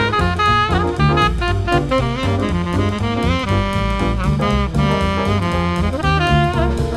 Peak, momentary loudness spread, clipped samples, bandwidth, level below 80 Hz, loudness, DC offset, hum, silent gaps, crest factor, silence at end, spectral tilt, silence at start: -2 dBFS; 4 LU; under 0.1%; 12.5 kHz; -24 dBFS; -17 LUFS; under 0.1%; none; none; 16 dB; 0 s; -6.5 dB/octave; 0 s